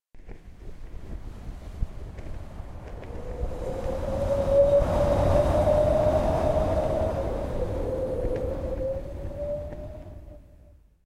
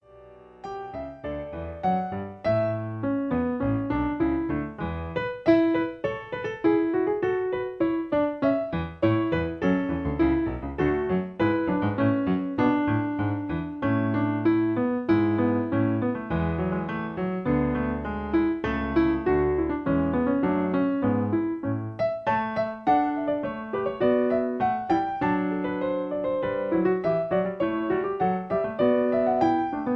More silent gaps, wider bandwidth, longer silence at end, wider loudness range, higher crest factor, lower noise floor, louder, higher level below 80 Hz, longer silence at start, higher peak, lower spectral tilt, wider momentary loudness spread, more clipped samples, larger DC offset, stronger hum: neither; first, 14 kHz vs 6 kHz; first, 0.5 s vs 0 s; first, 15 LU vs 2 LU; about the same, 16 dB vs 16 dB; first, -54 dBFS vs -49 dBFS; about the same, -26 LUFS vs -26 LUFS; first, -34 dBFS vs -46 dBFS; about the same, 0.15 s vs 0.15 s; about the same, -10 dBFS vs -8 dBFS; second, -8 dB/octave vs -9.5 dB/octave; first, 20 LU vs 7 LU; neither; neither; neither